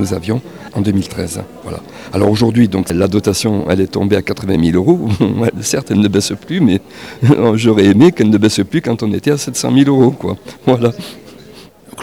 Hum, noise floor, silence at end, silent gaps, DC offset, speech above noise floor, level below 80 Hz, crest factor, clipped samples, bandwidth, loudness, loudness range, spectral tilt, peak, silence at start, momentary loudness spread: none; -38 dBFS; 0 s; none; 0.2%; 25 dB; -42 dBFS; 12 dB; under 0.1%; 19 kHz; -13 LUFS; 3 LU; -6 dB/octave; 0 dBFS; 0 s; 12 LU